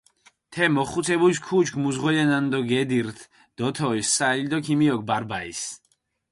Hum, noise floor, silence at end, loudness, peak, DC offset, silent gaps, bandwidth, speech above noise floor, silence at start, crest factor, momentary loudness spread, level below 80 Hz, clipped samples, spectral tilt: none; -56 dBFS; 0.55 s; -23 LUFS; -8 dBFS; under 0.1%; none; 11.5 kHz; 33 dB; 0.5 s; 16 dB; 10 LU; -60 dBFS; under 0.1%; -4.5 dB/octave